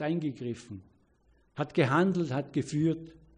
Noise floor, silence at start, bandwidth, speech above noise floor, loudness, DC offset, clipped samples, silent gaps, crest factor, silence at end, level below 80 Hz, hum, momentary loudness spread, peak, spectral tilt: -67 dBFS; 0 s; 10 kHz; 37 dB; -30 LUFS; under 0.1%; under 0.1%; none; 18 dB; 0.25 s; -66 dBFS; none; 19 LU; -12 dBFS; -7 dB/octave